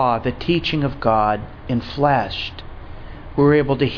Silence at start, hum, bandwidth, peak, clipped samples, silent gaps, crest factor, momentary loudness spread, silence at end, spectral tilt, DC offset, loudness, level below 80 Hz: 0 s; none; 5.4 kHz; -2 dBFS; under 0.1%; none; 18 dB; 22 LU; 0 s; -8 dB/octave; under 0.1%; -20 LUFS; -36 dBFS